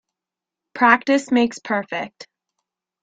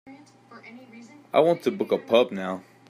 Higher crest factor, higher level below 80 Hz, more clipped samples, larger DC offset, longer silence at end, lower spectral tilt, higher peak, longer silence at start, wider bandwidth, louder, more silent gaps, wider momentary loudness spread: about the same, 20 dB vs 20 dB; first, -68 dBFS vs -76 dBFS; neither; neither; first, 0.8 s vs 0.3 s; second, -4 dB/octave vs -6 dB/octave; first, -2 dBFS vs -6 dBFS; first, 0.75 s vs 0.05 s; second, 9.2 kHz vs 14.5 kHz; first, -19 LUFS vs -24 LUFS; neither; second, 15 LU vs 24 LU